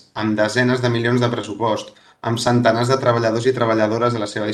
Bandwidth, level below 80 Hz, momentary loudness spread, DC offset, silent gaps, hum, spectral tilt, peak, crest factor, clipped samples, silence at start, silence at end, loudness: 12.5 kHz; -56 dBFS; 7 LU; under 0.1%; none; none; -6 dB/octave; 0 dBFS; 18 dB; under 0.1%; 0.15 s; 0 s; -18 LUFS